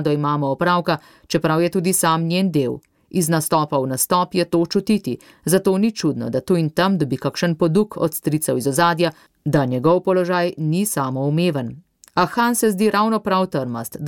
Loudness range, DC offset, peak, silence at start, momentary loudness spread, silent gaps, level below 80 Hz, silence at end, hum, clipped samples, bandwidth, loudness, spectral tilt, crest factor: 1 LU; under 0.1%; -6 dBFS; 0 s; 7 LU; none; -56 dBFS; 0 s; none; under 0.1%; 17.5 kHz; -19 LUFS; -5 dB/octave; 14 dB